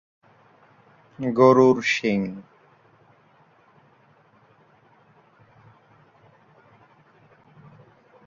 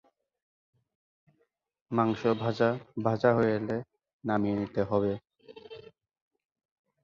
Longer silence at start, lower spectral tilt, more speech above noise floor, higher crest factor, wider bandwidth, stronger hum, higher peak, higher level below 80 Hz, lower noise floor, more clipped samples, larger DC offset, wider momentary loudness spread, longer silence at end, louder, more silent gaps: second, 1.2 s vs 1.9 s; second, -6 dB/octave vs -8.5 dB/octave; second, 39 dB vs 47 dB; about the same, 22 dB vs 22 dB; about the same, 7.4 kHz vs 7.2 kHz; neither; first, -4 dBFS vs -10 dBFS; about the same, -68 dBFS vs -64 dBFS; second, -58 dBFS vs -75 dBFS; neither; neither; about the same, 17 LU vs 16 LU; first, 5.85 s vs 1.25 s; first, -20 LUFS vs -29 LUFS; second, none vs 4.13-4.19 s